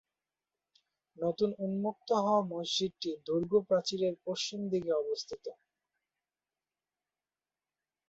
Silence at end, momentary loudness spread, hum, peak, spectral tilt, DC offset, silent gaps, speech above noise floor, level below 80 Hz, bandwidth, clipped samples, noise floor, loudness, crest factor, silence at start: 2.55 s; 9 LU; none; -16 dBFS; -5 dB/octave; under 0.1%; none; over 57 dB; -74 dBFS; 8.2 kHz; under 0.1%; under -90 dBFS; -33 LUFS; 20 dB; 1.2 s